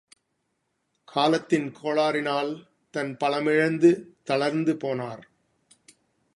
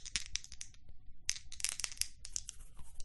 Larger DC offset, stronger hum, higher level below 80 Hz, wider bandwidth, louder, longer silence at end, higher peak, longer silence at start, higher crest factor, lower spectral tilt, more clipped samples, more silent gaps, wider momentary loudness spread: neither; neither; second, -74 dBFS vs -54 dBFS; about the same, 11.5 kHz vs 12 kHz; first, -25 LUFS vs -41 LUFS; first, 1.15 s vs 0 s; first, -8 dBFS vs -12 dBFS; first, 1.1 s vs 0 s; second, 20 dB vs 30 dB; first, -6 dB/octave vs 1 dB/octave; neither; neither; about the same, 12 LU vs 14 LU